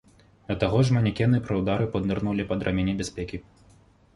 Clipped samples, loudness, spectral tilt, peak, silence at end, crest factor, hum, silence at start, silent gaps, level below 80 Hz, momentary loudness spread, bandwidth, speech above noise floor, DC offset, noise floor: under 0.1%; -26 LUFS; -7 dB/octave; -8 dBFS; 0.75 s; 18 dB; none; 0.5 s; none; -44 dBFS; 11 LU; 11.5 kHz; 32 dB; under 0.1%; -57 dBFS